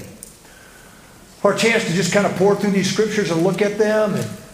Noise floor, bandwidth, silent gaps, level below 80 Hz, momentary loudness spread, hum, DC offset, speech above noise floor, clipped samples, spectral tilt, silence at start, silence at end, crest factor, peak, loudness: -44 dBFS; 15.5 kHz; none; -54 dBFS; 8 LU; none; under 0.1%; 27 dB; under 0.1%; -5 dB/octave; 0 s; 0 s; 20 dB; 0 dBFS; -18 LUFS